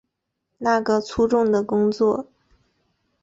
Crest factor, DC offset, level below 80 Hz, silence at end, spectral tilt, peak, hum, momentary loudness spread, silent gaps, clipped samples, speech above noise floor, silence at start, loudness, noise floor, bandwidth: 14 dB; under 0.1%; -52 dBFS; 1 s; -6 dB/octave; -8 dBFS; none; 4 LU; none; under 0.1%; 58 dB; 0.6 s; -21 LUFS; -78 dBFS; 7.8 kHz